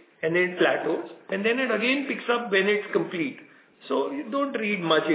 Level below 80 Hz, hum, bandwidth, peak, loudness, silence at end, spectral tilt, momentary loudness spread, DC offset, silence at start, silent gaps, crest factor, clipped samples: -82 dBFS; none; 4 kHz; -10 dBFS; -25 LUFS; 0 s; -8.5 dB/octave; 7 LU; under 0.1%; 0.2 s; none; 16 dB; under 0.1%